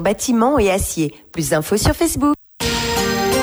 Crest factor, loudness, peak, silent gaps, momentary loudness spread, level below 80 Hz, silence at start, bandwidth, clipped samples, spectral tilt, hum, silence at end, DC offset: 14 dB; -18 LUFS; -4 dBFS; none; 6 LU; -32 dBFS; 0 s; over 20 kHz; under 0.1%; -4 dB/octave; none; 0 s; under 0.1%